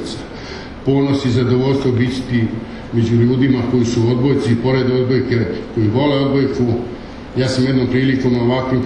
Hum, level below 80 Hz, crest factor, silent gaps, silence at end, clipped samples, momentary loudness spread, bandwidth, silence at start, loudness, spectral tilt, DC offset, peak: none; -38 dBFS; 14 dB; none; 0 s; under 0.1%; 10 LU; 10 kHz; 0 s; -16 LUFS; -7.5 dB/octave; under 0.1%; -2 dBFS